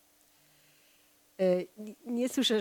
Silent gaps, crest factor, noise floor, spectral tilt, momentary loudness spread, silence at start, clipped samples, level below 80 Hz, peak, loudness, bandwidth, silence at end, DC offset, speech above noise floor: none; 16 dB; -65 dBFS; -4.5 dB/octave; 15 LU; 1.4 s; under 0.1%; -84 dBFS; -16 dBFS; -31 LUFS; 19 kHz; 0 s; under 0.1%; 35 dB